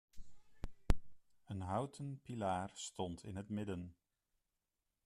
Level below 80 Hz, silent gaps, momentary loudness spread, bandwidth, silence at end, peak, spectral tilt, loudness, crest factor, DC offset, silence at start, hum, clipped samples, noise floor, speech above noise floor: -48 dBFS; none; 13 LU; 12.5 kHz; 1.15 s; -16 dBFS; -6 dB/octave; -44 LUFS; 26 dB; under 0.1%; 0.15 s; none; under 0.1%; -89 dBFS; 45 dB